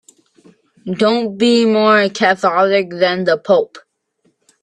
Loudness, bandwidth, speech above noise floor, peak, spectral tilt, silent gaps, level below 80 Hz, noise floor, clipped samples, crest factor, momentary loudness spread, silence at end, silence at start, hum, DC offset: -14 LUFS; 10.5 kHz; 48 dB; 0 dBFS; -5 dB/octave; none; -62 dBFS; -62 dBFS; under 0.1%; 16 dB; 5 LU; 0.85 s; 0.85 s; none; under 0.1%